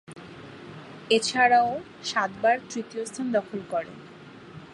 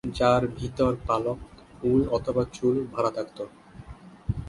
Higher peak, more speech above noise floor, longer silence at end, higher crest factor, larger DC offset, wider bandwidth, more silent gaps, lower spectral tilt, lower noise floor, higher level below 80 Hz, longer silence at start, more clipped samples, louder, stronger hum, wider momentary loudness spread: about the same, -8 dBFS vs -8 dBFS; about the same, 21 dB vs 20 dB; about the same, 0 s vs 0 s; about the same, 20 dB vs 20 dB; neither; about the same, 11.5 kHz vs 11.5 kHz; neither; second, -3 dB/octave vs -7 dB/octave; about the same, -46 dBFS vs -45 dBFS; second, -66 dBFS vs -44 dBFS; about the same, 0.1 s vs 0.05 s; neither; about the same, -25 LUFS vs -26 LUFS; neither; first, 25 LU vs 17 LU